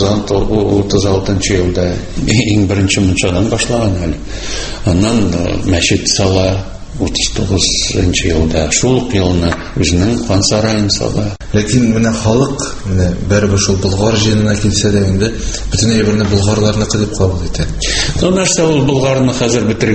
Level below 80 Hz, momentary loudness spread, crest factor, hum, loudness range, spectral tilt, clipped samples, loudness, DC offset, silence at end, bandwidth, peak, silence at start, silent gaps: -24 dBFS; 6 LU; 12 dB; none; 1 LU; -4.5 dB/octave; under 0.1%; -13 LUFS; under 0.1%; 0 s; 8.8 kHz; 0 dBFS; 0 s; none